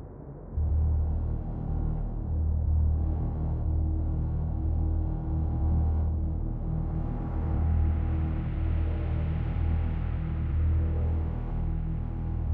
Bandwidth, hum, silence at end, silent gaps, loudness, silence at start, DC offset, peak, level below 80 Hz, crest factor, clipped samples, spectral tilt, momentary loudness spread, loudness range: 3.2 kHz; none; 0 s; none; -30 LUFS; 0 s; under 0.1%; -16 dBFS; -32 dBFS; 10 dB; under 0.1%; -12 dB/octave; 6 LU; 1 LU